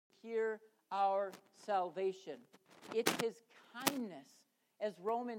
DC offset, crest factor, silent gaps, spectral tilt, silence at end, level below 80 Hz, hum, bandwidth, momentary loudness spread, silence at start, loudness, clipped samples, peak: under 0.1%; 30 dB; none; -3 dB/octave; 0 s; under -90 dBFS; none; 16.5 kHz; 17 LU; 0.25 s; -39 LUFS; under 0.1%; -10 dBFS